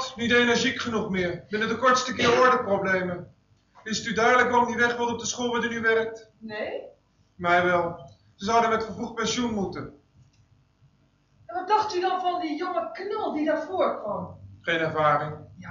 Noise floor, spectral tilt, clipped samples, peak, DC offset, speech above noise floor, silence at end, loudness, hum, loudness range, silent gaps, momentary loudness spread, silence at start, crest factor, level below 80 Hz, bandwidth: -64 dBFS; -4 dB/octave; under 0.1%; -8 dBFS; under 0.1%; 39 dB; 0 s; -25 LUFS; none; 7 LU; none; 14 LU; 0 s; 18 dB; -60 dBFS; 7.6 kHz